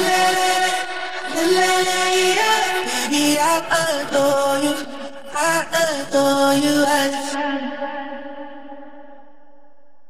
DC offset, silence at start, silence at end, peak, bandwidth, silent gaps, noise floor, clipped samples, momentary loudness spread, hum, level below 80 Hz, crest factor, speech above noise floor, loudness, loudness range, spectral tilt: 2%; 0 s; 0.9 s; -4 dBFS; 16 kHz; none; -57 dBFS; under 0.1%; 15 LU; none; -60 dBFS; 16 dB; 38 dB; -18 LUFS; 4 LU; -2 dB/octave